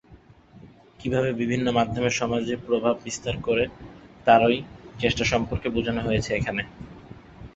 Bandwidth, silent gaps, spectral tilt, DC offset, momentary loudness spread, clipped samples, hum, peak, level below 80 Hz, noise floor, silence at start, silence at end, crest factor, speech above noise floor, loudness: 8.2 kHz; none; -5 dB/octave; under 0.1%; 21 LU; under 0.1%; none; -2 dBFS; -46 dBFS; -52 dBFS; 0.1 s; 0.1 s; 22 dB; 28 dB; -24 LUFS